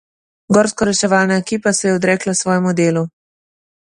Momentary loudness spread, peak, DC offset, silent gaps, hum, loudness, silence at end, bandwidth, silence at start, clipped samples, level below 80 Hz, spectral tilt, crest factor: 3 LU; 0 dBFS; under 0.1%; none; none; -15 LUFS; 0.8 s; 11.5 kHz; 0.5 s; under 0.1%; -52 dBFS; -4.5 dB/octave; 16 dB